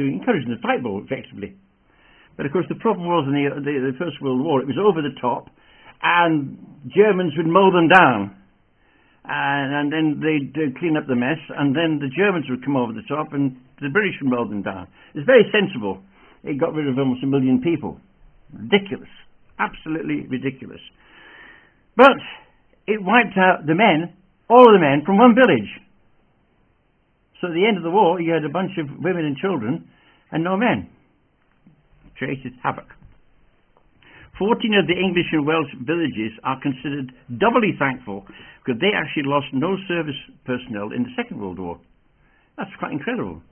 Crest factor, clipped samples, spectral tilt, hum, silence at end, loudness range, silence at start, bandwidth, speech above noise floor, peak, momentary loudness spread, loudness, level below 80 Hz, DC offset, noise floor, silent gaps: 20 dB; under 0.1%; -8.5 dB/octave; none; 0.1 s; 10 LU; 0 s; 4.7 kHz; 43 dB; 0 dBFS; 17 LU; -20 LUFS; -58 dBFS; under 0.1%; -63 dBFS; none